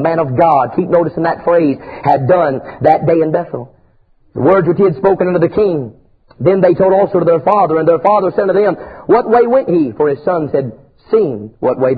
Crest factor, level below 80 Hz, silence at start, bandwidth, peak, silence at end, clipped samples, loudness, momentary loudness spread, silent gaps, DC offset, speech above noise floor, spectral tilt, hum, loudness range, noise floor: 12 dB; -48 dBFS; 0 s; 4.9 kHz; 0 dBFS; 0 s; under 0.1%; -13 LUFS; 8 LU; none; under 0.1%; 38 dB; -10.5 dB/octave; none; 2 LU; -50 dBFS